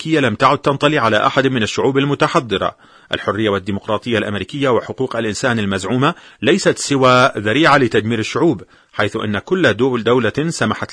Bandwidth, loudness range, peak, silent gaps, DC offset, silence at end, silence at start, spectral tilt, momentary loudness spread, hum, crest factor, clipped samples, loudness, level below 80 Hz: 10.5 kHz; 4 LU; 0 dBFS; none; under 0.1%; 0 s; 0 s; -5 dB/octave; 9 LU; none; 16 dB; under 0.1%; -16 LUFS; -50 dBFS